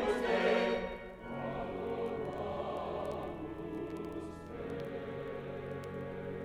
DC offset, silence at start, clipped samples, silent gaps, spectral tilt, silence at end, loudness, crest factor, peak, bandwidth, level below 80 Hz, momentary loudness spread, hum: under 0.1%; 0 s; under 0.1%; none; -6.5 dB/octave; 0 s; -38 LUFS; 18 dB; -18 dBFS; 14.5 kHz; -58 dBFS; 12 LU; none